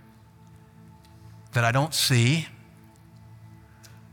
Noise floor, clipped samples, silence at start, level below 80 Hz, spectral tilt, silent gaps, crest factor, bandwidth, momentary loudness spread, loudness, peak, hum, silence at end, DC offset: -52 dBFS; under 0.1%; 1.55 s; -60 dBFS; -4 dB/octave; none; 22 dB; 18.5 kHz; 9 LU; -23 LUFS; -6 dBFS; none; 0.65 s; under 0.1%